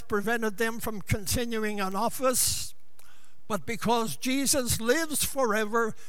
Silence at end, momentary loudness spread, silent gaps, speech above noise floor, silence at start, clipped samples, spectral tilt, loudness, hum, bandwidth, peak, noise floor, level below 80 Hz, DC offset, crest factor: 0 s; 8 LU; none; 32 dB; 0.1 s; under 0.1%; -3 dB/octave; -28 LUFS; none; 19 kHz; -10 dBFS; -60 dBFS; -50 dBFS; 2%; 18 dB